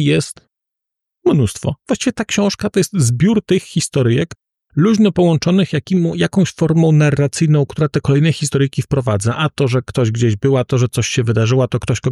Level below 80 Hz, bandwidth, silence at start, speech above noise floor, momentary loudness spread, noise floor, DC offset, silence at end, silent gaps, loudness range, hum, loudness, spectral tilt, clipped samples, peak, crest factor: -44 dBFS; 13 kHz; 0 s; 68 dB; 6 LU; -82 dBFS; under 0.1%; 0 s; none; 2 LU; none; -16 LUFS; -6 dB/octave; under 0.1%; -4 dBFS; 12 dB